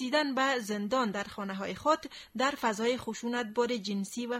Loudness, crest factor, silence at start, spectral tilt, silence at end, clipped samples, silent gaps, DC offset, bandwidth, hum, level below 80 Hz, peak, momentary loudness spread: -32 LUFS; 18 dB; 0 s; -4 dB/octave; 0 s; under 0.1%; none; under 0.1%; 16 kHz; none; -68 dBFS; -14 dBFS; 7 LU